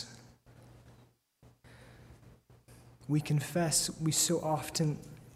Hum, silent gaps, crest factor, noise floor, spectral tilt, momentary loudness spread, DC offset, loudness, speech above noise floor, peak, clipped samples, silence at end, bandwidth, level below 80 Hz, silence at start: none; none; 20 dB; -64 dBFS; -4 dB/octave; 12 LU; under 0.1%; -31 LUFS; 33 dB; -16 dBFS; under 0.1%; 0.05 s; 16 kHz; -64 dBFS; 0 s